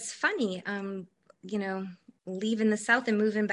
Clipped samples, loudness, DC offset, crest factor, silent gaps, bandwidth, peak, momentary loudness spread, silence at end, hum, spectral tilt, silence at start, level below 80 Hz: under 0.1%; -30 LUFS; under 0.1%; 20 dB; none; 11.5 kHz; -10 dBFS; 16 LU; 0 s; none; -4.5 dB/octave; 0 s; -76 dBFS